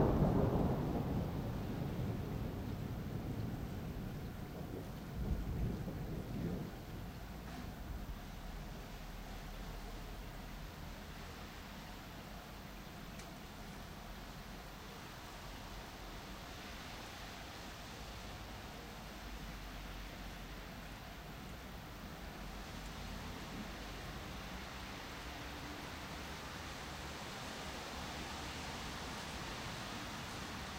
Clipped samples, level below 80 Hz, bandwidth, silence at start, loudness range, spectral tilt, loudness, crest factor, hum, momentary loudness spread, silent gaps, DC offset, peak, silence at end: under 0.1%; -50 dBFS; 16 kHz; 0 s; 7 LU; -5.5 dB/octave; -45 LUFS; 24 dB; none; 9 LU; none; under 0.1%; -20 dBFS; 0 s